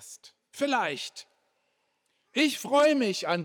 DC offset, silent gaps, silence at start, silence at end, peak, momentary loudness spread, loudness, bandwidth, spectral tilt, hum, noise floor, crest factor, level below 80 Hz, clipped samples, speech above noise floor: under 0.1%; none; 0 s; 0 s; -10 dBFS; 23 LU; -26 LUFS; over 20 kHz; -3.5 dB/octave; none; -75 dBFS; 20 dB; -78 dBFS; under 0.1%; 49 dB